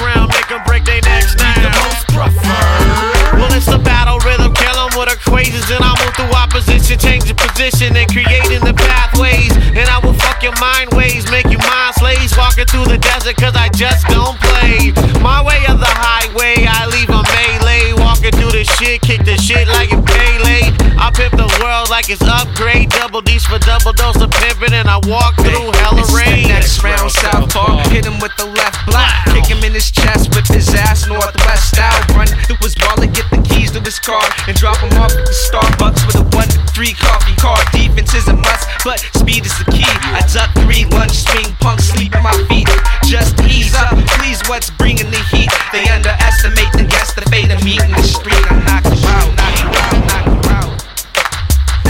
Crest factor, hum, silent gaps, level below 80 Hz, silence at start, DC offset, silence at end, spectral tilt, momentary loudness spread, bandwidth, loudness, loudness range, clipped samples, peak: 10 dB; none; none; -12 dBFS; 0 s; under 0.1%; 0 s; -4 dB/octave; 3 LU; 17 kHz; -11 LUFS; 2 LU; under 0.1%; 0 dBFS